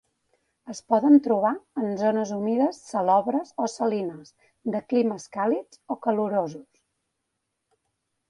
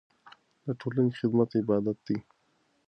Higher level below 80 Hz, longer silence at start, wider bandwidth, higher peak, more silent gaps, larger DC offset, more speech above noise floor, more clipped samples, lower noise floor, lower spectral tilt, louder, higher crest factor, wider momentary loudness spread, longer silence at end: second, -74 dBFS vs -68 dBFS; first, 0.65 s vs 0.25 s; first, 11 kHz vs 6.2 kHz; first, -6 dBFS vs -12 dBFS; neither; neither; first, 56 dB vs 43 dB; neither; first, -80 dBFS vs -71 dBFS; second, -6.5 dB/octave vs -9.5 dB/octave; first, -25 LUFS vs -29 LUFS; about the same, 20 dB vs 18 dB; first, 16 LU vs 10 LU; first, 1.7 s vs 0.65 s